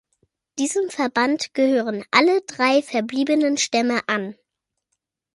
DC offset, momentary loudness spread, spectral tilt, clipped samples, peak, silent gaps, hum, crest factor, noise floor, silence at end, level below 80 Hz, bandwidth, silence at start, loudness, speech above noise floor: under 0.1%; 7 LU; -3 dB/octave; under 0.1%; 0 dBFS; none; none; 22 dB; -81 dBFS; 1 s; -70 dBFS; 11.5 kHz; 0.55 s; -20 LUFS; 61 dB